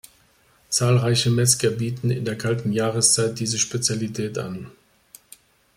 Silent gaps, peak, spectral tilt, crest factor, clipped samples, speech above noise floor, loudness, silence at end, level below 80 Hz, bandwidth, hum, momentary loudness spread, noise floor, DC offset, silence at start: none; -4 dBFS; -4 dB/octave; 20 dB; under 0.1%; 37 dB; -21 LUFS; 1.05 s; -58 dBFS; 16 kHz; none; 11 LU; -59 dBFS; under 0.1%; 0.7 s